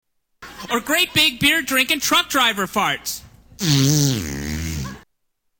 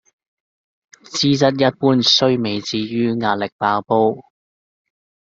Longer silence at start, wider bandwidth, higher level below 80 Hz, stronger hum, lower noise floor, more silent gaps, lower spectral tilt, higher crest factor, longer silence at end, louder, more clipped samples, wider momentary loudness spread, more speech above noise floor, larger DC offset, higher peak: second, 0.4 s vs 1.1 s; first, 19.5 kHz vs 7.8 kHz; first, -42 dBFS vs -60 dBFS; neither; second, -70 dBFS vs under -90 dBFS; second, none vs 3.52-3.59 s; second, -3 dB/octave vs -5 dB/octave; about the same, 16 dB vs 18 dB; second, 0.6 s vs 1.15 s; about the same, -18 LUFS vs -17 LUFS; neither; first, 13 LU vs 9 LU; second, 52 dB vs over 73 dB; neither; second, -6 dBFS vs -2 dBFS